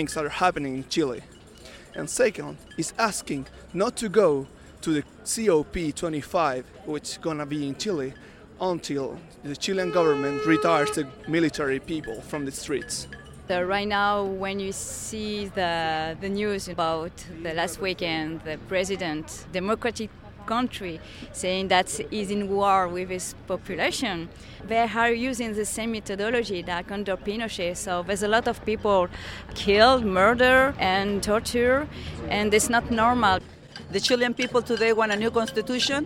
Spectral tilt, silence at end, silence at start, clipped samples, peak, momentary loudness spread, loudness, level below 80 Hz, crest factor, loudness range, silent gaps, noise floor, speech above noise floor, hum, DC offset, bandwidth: -4 dB/octave; 0 s; 0 s; under 0.1%; -4 dBFS; 13 LU; -25 LUFS; -48 dBFS; 20 dB; 7 LU; none; -46 dBFS; 21 dB; none; under 0.1%; 16.5 kHz